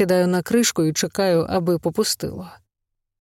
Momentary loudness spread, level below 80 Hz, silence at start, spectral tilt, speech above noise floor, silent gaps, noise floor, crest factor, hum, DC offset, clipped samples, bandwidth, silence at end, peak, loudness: 7 LU; -54 dBFS; 0 s; -4.5 dB/octave; 59 dB; none; -80 dBFS; 16 dB; none; under 0.1%; under 0.1%; 17 kHz; 0.65 s; -6 dBFS; -20 LUFS